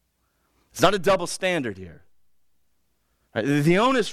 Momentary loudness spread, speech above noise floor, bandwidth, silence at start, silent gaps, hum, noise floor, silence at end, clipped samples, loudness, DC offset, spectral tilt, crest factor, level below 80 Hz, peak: 14 LU; 49 dB; 16 kHz; 0.75 s; none; none; -71 dBFS; 0 s; under 0.1%; -22 LUFS; under 0.1%; -5 dB/octave; 18 dB; -52 dBFS; -6 dBFS